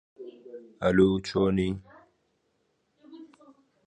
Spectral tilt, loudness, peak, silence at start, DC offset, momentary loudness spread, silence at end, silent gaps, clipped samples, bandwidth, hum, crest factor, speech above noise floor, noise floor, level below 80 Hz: -7 dB/octave; -25 LUFS; -8 dBFS; 0.2 s; under 0.1%; 24 LU; 0.6 s; none; under 0.1%; 9.4 kHz; none; 20 dB; 48 dB; -74 dBFS; -52 dBFS